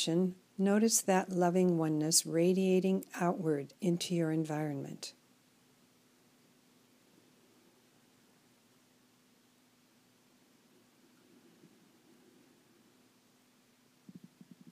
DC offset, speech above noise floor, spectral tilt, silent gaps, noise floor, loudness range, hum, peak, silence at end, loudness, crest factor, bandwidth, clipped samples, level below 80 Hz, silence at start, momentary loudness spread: under 0.1%; 37 dB; -4.5 dB/octave; none; -68 dBFS; 16 LU; none; -14 dBFS; 9.6 s; -32 LUFS; 22 dB; 15.5 kHz; under 0.1%; -88 dBFS; 0 s; 9 LU